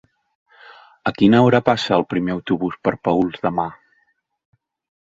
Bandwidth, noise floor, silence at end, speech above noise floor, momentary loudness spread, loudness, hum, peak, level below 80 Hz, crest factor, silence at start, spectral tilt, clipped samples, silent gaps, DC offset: 7.8 kHz; -65 dBFS; 1.3 s; 48 dB; 12 LU; -19 LUFS; none; 0 dBFS; -54 dBFS; 20 dB; 1.05 s; -7 dB/octave; under 0.1%; none; under 0.1%